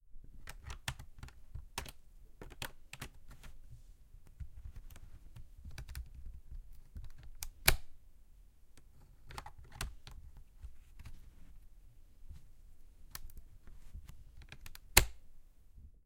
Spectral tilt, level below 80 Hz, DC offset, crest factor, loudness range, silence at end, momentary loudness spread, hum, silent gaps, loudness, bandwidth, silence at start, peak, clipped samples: -1.5 dB/octave; -48 dBFS; under 0.1%; 40 dB; 20 LU; 0 s; 28 LU; none; none; -38 LUFS; 16.5 kHz; 0.05 s; -4 dBFS; under 0.1%